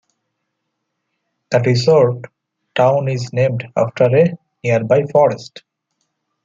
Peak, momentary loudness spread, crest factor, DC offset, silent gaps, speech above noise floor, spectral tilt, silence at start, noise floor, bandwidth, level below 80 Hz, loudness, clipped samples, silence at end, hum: 0 dBFS; 12 LU; 16 dB; under 0.1%; none; 60 dB; -7 dB/octave; 1.5 s; -74 dBFS; 7.6 kHz; -58 dBFS; -16 LUFS; under 0.1%; 0.95 s; none